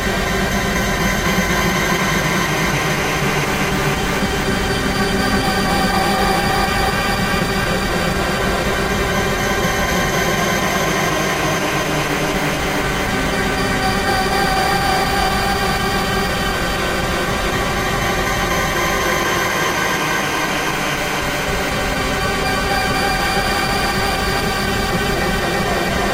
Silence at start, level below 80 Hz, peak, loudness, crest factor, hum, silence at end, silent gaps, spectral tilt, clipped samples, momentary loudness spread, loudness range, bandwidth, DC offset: 0 s; -30 dBFS; -2 dBFS; -17 LUFS; 14 dB; none; 0 s; none; -4 dB/octave; under 0.1%; 2 LU; 1 LU; 16 kHz; under 0.1%